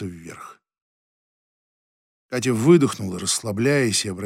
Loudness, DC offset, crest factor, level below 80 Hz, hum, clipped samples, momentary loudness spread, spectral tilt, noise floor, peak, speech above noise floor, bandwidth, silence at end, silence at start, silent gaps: -20 LUFS; under 0.1%; 20 dB; -64 dBFS; none; under 0.1%; 21 LU; -4.5 dB/octave; -41 dBFS; -4 dBFS; 22 dB; 15.5 kHz; 0 s; 0 s; 0.82-2.29 s